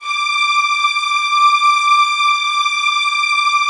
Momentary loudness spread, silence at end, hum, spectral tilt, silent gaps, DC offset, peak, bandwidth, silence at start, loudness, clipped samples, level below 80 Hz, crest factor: 3 LU; 0 s; none; 6.5 dB/octave; none; under 0.1%; -2 dBFS; 11.5 kHz; 0 s; -13 LUFS; under 0.1%; -66 dBFS; 12 dB